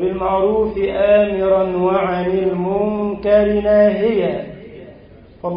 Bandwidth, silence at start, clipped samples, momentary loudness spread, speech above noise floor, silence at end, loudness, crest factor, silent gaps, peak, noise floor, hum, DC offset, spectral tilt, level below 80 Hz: 5.2 kHz; 0 s; under 0.1%; 8 LU; 27 dB; 0 s; -16 LUFS; 14 dB; none; -2 dBFS; -42 dBFS; none; under 0.1%; -12 dB/octave; -40 dBFS